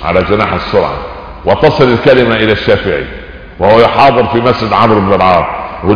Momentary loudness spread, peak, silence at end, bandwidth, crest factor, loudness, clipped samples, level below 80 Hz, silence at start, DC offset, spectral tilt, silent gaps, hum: 11 LU; 0 dBFS; 0 s; 5.4 kHz; 10 dB; -9 LUFS; 1%; -30 dBFS; 0 s; under 0.1%; -7.5 dB/octave; none; none